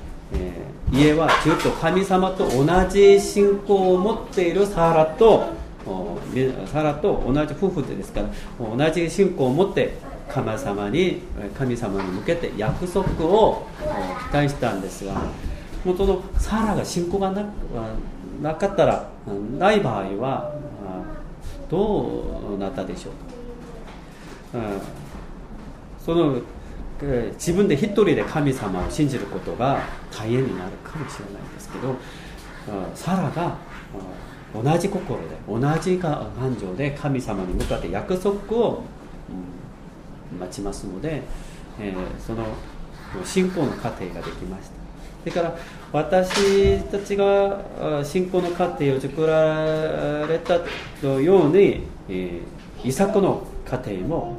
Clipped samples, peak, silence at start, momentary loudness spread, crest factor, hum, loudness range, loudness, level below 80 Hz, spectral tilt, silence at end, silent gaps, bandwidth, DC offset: under 0.1%; -4 dBFS; 0 s; 19 LU; 20 dB; none; 11 LU; -22 LUFS; -36 dBFS; -6.5 dB/octave; 0 s; none; 15 kHz; under 0.1%